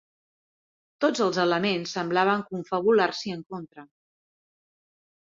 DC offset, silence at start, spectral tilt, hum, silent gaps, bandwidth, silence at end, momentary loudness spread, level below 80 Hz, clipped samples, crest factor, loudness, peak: under 0.1%; 1 s; -5 dB/octave; none; 3.46-3.50 s; 7.8 kHz; 1.35 s; 14 LU; -70 dBFS; under 0.1%; 20 dB; -25 LUFS; -8 dBFS